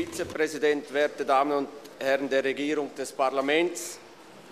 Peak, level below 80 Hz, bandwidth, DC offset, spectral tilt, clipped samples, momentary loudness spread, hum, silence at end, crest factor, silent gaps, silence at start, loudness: -10 dBFS; -68 dBFS; 15 kHz; under 0.1%; -3 dB/octave; under 0.1%; 10 LU; none; 0 s; 16 dB; none; 0 s; -27 LUFS